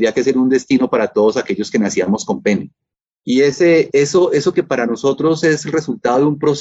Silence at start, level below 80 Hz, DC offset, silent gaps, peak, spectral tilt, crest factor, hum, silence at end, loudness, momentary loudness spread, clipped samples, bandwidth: 0 s; -56 dBFS; under 0.1%; 3.13-3.17 s; -4 dBFS; -5.5 dB/octave; 12 dB; none; 0 s; -15 LUFS; 6 LU; under 0.1%; 8 kHz